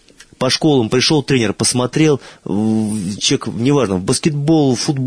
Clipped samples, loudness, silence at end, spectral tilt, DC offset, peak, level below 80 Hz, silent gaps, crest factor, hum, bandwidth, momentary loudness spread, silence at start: under 0.1%; -15 LUFS; 0 s; -4.5 dB/octave; 0.1%; -2 dBFS; -48 dBFS; none; 14 dB; none; 11 kHz; 5 LU; 0.4 s